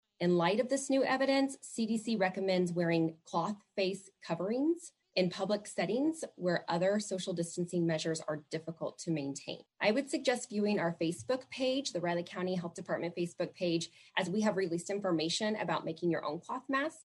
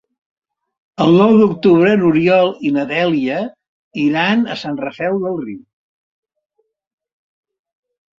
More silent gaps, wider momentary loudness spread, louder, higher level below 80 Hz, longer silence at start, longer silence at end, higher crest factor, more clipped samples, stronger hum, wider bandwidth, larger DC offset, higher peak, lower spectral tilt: second, none vs 3.68-3.91 s; second, 7 LU vs 15 LU; second, -34 LUFS vs -15 LUFS; second, -80 dBFS vs -58 dBFS; second, 0.2 s vs 1 s; second, 0.05 s vs 2.6 s; about the same, 18 dB vs 16 dB; neither; neither; first, 12 kHz vs 7.4 kHz; neither; second, -16 dBFS vs 0 dBFS; second, -5 dB/octave vs -7.5 dB/octave